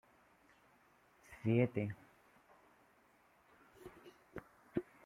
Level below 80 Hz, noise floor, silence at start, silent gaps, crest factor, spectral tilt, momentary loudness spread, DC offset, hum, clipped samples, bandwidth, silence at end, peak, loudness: -74 dBFS; -71 dBFS; 1.3 s; none; 24 dB; -9 dB/octave; 24 LU; under 0.1%; none; under 0.1%; 14 kHz; 0.25 s; -20 dBFS; -39 LUFS